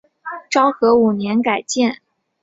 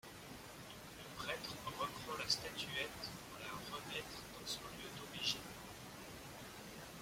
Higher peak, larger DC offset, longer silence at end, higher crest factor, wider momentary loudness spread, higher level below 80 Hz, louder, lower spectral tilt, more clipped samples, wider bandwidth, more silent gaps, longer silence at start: first, 0 dBFS vs -24 dBFS; neither; first, 0.45 s vs 0 s; second, 16 dB vs 24 dB; first, 18 LU vs 13 LU; first, -60 dBFS vs -68 dBFS; first, -17 LUFS vs -45 LUFS; first, -4.5 dB/octave vs -2.5 dB/octave; neither; second, 8 kHz vs 16.5 kHz; neither; first, 0.25 s vs 0.05 s